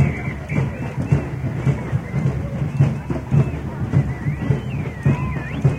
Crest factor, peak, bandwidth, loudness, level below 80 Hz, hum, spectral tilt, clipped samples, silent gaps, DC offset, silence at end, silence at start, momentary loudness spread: 16 dB; -4 dBFS; 8.8 kHz; -22 LUFS; -34 dBFS; none; -8.5 dB/octave; under 0.1%; none; under 0.1%; 0 s; 0 s; 6 LU